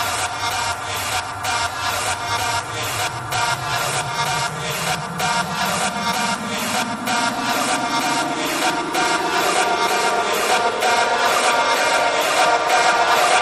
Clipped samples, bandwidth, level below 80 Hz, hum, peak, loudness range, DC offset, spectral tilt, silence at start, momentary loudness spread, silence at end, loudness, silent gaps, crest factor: under 0.1%; 14.5 kHz; -52 dBFS; none; -4 dBFS; 5 LU; under 0.1%; -2 dB/octave; 0 s; 6 LU; 0 s; -19 LUFS; none; 16 dB